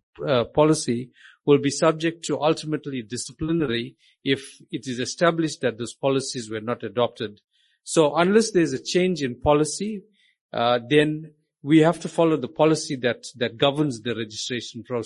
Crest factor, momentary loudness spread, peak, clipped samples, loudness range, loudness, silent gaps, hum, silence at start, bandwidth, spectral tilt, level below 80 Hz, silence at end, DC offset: 18 dB; 12 LU; -4 dBFS; under 0.1%; 4 LU; -23 LUFS; 10.41-10.49 s; none; 0.2 s; 11.5 kHz; -5 dB/octave; -54 dBFS; 0 s; under 0.1%